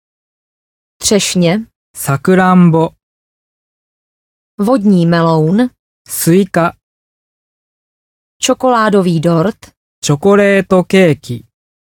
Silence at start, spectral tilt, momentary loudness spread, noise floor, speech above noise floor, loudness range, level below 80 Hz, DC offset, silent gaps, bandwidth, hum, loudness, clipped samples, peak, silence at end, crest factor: 1 s; -5.5 dB/octave; 10 LU; under -90 dBFS; over 80 dB; 4 LU; -50 dBFS; under 0.1%; 1.75-1.94 s, 3.03-4.58 s, 5.79-6.05 s, 6.83-8.40 s, 9.77-10.02 s; 18.5 kHz; none; -12 LUFS; under 0.1%; 0 dBFS; 0.55 s; 14 dB